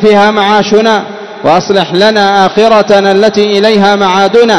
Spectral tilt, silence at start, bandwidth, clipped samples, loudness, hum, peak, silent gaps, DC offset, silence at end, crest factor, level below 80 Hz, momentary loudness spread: -5 dB/octave; 0 s; 12 kHz; 6%; -7 LUFS; none; 0 dBFS; none; 0.8%; 0 s; 6 dB; -46 dBFS; 4 LU